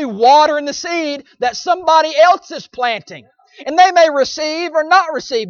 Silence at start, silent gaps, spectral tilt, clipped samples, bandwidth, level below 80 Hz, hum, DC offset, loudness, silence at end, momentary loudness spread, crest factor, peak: 0 s; none; -2.5 dB/octave; under 0.1%; 7.2 kHz; -60 dBFS; none; under 0.1%; -14 LUFS; 0 s; 11 LU; 14 dB; 0 dBFS